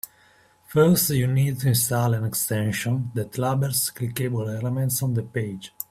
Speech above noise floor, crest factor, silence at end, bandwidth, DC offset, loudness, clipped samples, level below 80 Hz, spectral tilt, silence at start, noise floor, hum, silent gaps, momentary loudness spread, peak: 34 dB; 18 dB; 0.1 s; 16 kHz; under 0.1%; -23 LUFS; under 0.1%; -56 dBFS; -5 dB/octave; 0.05 s; -57 dBFS; none; none; 9 LU; -6 dBFS